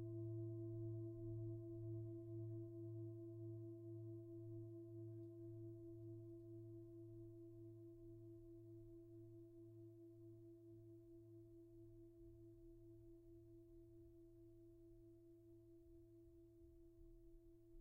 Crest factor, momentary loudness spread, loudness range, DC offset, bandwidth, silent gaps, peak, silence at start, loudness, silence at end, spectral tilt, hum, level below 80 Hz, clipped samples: 14 dB; 16 LU; 13 LU; under 0.1%; 1.2 kHz; none; -42 dBFS; 0 s; -58 LUFS; 0 s; -11.5 dB/octave; none; -74 dBFS; under 0.1%